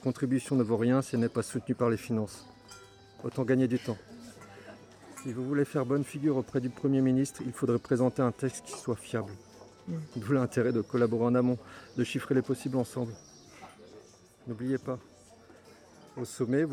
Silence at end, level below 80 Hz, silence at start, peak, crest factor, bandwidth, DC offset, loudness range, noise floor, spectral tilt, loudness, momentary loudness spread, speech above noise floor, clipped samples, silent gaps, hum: 0 s; -68 dBFS; 0 s; -14 dBFS; 18 dB; 15 kHz; under 0.1%; 6 LU; -56 dBFS; -7 dB/octave; -31 LUFS; 22 LU; 26 dB; under 0.1%; none; none